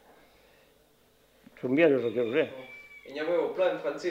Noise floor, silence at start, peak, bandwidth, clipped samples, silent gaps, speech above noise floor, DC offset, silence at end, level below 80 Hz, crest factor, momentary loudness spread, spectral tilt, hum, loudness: -64 dBFS; 1.65 s; -10 dBFS; 15 kHz; under 0.1%; none; 36 dB; under 0.1%; 0 s; -74 dBFS; 22 dB; 20 LU; -6.5 dB/octave; none; -28 LUFS